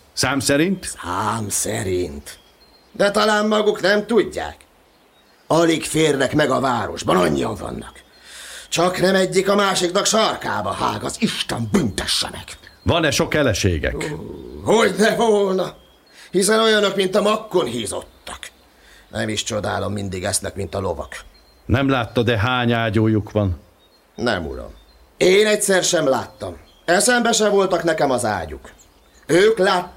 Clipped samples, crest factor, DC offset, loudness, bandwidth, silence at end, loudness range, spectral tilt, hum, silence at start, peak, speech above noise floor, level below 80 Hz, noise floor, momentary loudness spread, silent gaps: under 0.1%; 16 dB; under 0.1%; -19 LUFS; 16 kHz; 0.05 s; 4 LU; -4 dB/octave; none; 0.15 s; -4 dBFS; 35 dB; -44 dBFS; -54 dBFS; 16 LU; none